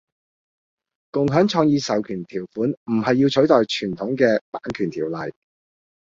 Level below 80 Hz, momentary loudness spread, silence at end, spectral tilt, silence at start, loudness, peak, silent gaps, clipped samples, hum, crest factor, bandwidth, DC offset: -58 dBFS; 12 LU; 0.8 s; -6 dB/octave; 1.15 s; -21 LUFS; -2 dBFS; 2.77-2.86 s, 4.41-4.52 s; under 0.1%; none; 20 dB; 7.8 kHz; under 0.1%